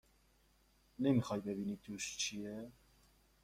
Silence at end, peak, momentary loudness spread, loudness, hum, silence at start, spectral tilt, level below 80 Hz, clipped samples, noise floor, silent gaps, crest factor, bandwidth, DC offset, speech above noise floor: 0.7 s; -22 dBFS; 13 LU; -39 LUFS; none; 1 s; -4.5 dB/octave; -70 dBFS; under 0.1%; -72 dBFS; none; 20 dB; 16 kHz; under 0.1%; 33 dB